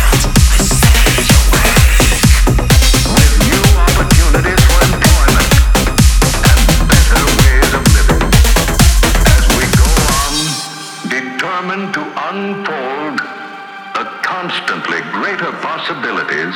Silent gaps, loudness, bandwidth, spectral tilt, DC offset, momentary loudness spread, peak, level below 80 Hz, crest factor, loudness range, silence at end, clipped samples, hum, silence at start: none; -11 LUFS; 19 kHz; -4 dB/octave; under 0.1%; 10 LU; 0 dBFS; -12 dBFS; 10 dB; 10 LU; 0 s; 0.2%; none; 0 s